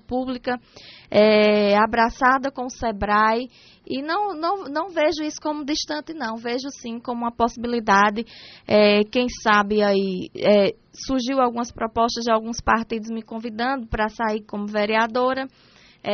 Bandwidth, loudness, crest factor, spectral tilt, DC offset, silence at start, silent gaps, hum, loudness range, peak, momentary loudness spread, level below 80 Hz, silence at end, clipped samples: 6.6 kHz; -21 LUFS; 18 dB; -3 dB/octave; under 0.1%; 0.1 s; none; none; 6 LU; -4 dBFS; 12 LU; -46 dBFS; 0 s; under 0.1%